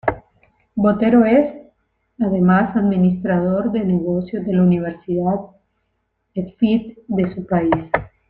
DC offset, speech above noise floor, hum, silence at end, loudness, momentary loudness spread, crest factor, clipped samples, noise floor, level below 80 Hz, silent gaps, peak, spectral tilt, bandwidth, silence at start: under 0.1%; 54 dB; none; 0.25 s; -18 LUFS; 10 LU; 18 dB; under 0.1%; -70 dBFS; -48 dBFS; none; 0 dBFS; -11 dB/octave; 4.3 kHz; 0.05 s